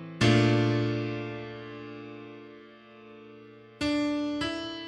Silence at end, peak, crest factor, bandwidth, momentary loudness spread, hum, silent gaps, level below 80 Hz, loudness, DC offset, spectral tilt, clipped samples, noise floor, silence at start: 0 s; -10 dBFS; 20 dB; 10.5 kHz; 26 LU; none; none; -56 dBFS; -28 LUFS; under 0.1%; -6 dB/octave; under 0.1%; -51 dBFS; 0 s